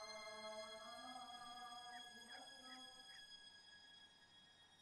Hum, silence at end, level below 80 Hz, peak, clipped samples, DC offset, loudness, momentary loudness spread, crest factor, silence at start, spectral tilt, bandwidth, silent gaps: none; 0 s; -86 dBFS; -42 dBFS; under 0.1%; under 0.1%; -56 LUFS; 12 LU; 16 dB; 0 s; -1 dB/octave; 13 kHz; none